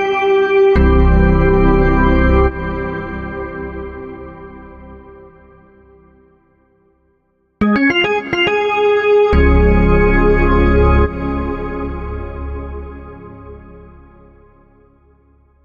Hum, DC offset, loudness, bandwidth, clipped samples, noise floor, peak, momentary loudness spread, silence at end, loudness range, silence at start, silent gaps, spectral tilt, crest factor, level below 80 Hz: none; under 0.1%; -14 LUFS; 6.8 kHz; under 0.1%; -61 dBFS; -2 dBFS; 21 LU; 1.8 s; 18 LU; 0 s; none; -8.5 dB/octave; 14 dB; -20 dBFS